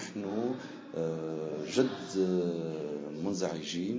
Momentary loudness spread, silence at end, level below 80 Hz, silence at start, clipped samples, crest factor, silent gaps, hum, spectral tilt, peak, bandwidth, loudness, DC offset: 7 LU; 0 s; -70 dBFS; 0 s; under 0.1%; 20 dB; none; none; -5.5 dB/octave; -14 dBFS; 8 kHz; -34 LUFS; under 0.1%